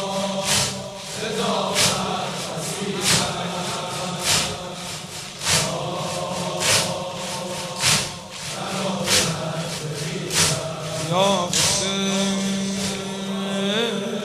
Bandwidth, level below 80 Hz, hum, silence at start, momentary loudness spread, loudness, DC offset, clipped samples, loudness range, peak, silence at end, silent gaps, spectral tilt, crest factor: 16 kHz; -52 dBFS; none; 0 s; 10 LU; -22 LUFS; under 0.1%; under 0.1%; 2 LU; -4 dBFS; 0 s; none; -2.5 dB/octave; 20 dB